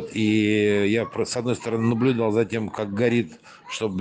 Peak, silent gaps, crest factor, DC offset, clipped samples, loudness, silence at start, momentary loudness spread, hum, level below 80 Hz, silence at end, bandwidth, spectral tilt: -8 dBFS; none; 16 dB; under 0.1%; under 0.1%; -23 LUFS; 0 s; 8 LU; none; -64 dBFS; 0 s; 9.6 kHz; -6 dB/octave